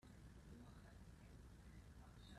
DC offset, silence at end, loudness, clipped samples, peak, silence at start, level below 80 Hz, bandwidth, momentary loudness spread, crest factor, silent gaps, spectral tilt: under 0.1%; 0 s; -63 LUFS; under 0.1%; -50 dBFS; 0 s; -66 dBFS; 13.5 kHz; 2 LU; 12 dB; none; -5.5 dB/octave